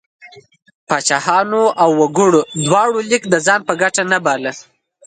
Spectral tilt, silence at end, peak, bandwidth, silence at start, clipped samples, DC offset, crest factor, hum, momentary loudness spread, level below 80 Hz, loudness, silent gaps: -3.5 dB/octave; 0.45 s; 0 dBFS; 9.6 kHz; 0.25 s; under 0.1%; under 0.1%; 16 dB; none; 6 LU; -62 dBFS; -14 LUFS; 0.75-0.87 s